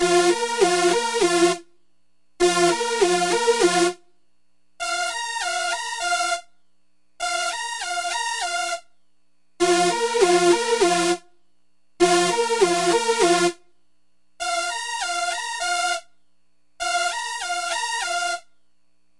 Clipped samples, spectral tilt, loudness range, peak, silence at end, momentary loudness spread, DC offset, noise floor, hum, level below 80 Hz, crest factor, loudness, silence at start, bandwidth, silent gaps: under 0.1%; -2.5 dB/octave; 6 LU; -4 dBFS; 0.8 s; 9 LU; 0.2%; -73 dBFS; 60 Hz at -65 dBFS; -58 dBFS; 18 dB; -21 LUFS; 0 s; 11.5 kHz; none